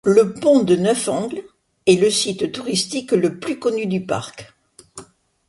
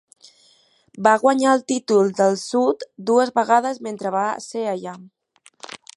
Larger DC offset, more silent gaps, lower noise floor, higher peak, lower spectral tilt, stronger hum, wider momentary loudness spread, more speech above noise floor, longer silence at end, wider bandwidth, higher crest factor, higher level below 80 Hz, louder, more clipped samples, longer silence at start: neither; neither; second, -44 dBFS vs -58 dBFS; about the same, -2 dBFS vs -2 dBFS; about the same, -4.5 dB/octave vs -4.5 dB/octave; neither; about the same, 11 LU vs 13 LU; second, 26 dB vs 39 dB; first, 0.45 s vs 0.2 s; about the same, 11.5 kHz vs 11.5 kHz; about the same, 18 dB vs 20 dB; first, -60 dBFS vs -74 dBFS; about the same, -19 LUFS vs -20 LUFS; neither; second, 0.05 s vs 0.95 s